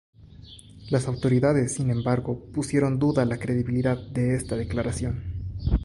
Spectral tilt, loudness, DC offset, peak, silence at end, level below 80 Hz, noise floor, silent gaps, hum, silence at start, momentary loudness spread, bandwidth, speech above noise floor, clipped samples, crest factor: -7 dB/octave; -26 LUFS; under 0.1%; -8 dBFS; 0 s; -38 dBFS; -46 dBFS; none; none; 0.2 s; 10 LU; 11.5 kHz; 22 dB; under 0.1%; 16 dB